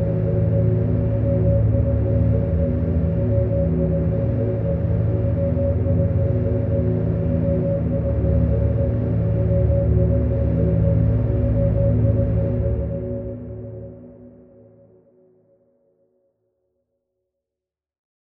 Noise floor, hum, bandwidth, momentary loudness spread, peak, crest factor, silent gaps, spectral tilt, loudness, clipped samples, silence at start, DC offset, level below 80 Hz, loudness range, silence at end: -86 dBFS; none; 2.9 kHz; 4 LU; -6 dBFS; 14 dB; none; -13.5 dB/octave; -20 LUFS; under 0.1%; 0 s; under 0.1%; -28 dBFS; 7 LU; 4 s